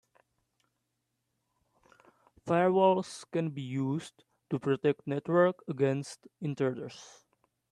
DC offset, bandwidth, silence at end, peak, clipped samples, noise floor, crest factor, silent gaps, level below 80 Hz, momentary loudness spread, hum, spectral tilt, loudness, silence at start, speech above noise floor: under 0.1%; 11.5 kHz; 0.65 s; -12 dBFS; under 0.1%; -82 dBFS; 20 dB; none; -76 dBFS; 17 LU; none; -7 dB/octave; -30 LUFS; 2.45 s; 52 dB